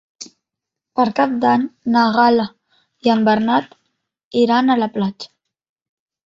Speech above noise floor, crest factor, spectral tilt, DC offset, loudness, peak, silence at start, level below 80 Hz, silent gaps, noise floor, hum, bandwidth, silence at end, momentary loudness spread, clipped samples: 68 dB; 16 dB; -6 dB/octave; under 0.1%; -17 LUFS; -2 dBFS; 0.2 s; -62 dBFS; 4.24-4.31 s; -83 dBFS; none; 7.6 kHz; 1.1 s; 19 LU; under 0.1%